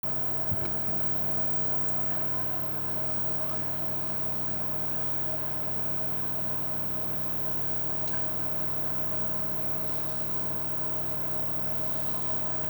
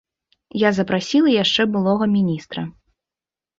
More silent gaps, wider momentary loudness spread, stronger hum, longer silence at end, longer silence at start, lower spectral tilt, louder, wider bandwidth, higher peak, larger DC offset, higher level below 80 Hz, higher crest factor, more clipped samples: neither; second, 3 LU vs 14 LU; neither; second, 0 s vs 0.9 s; second, 0.05 s vs 0.55 s; about the same, -6 dB/octave vs -5.5 dB/octave; second, -24 LUFS vs -18 LUFS; first, over 20 kHz vs 7.6 kHz; second, -14 dBFS vs -4 dBFS; neither; about the same, -60 dBFS vs -58 dBFS; about the same, 14 dB vs 18 dB; neither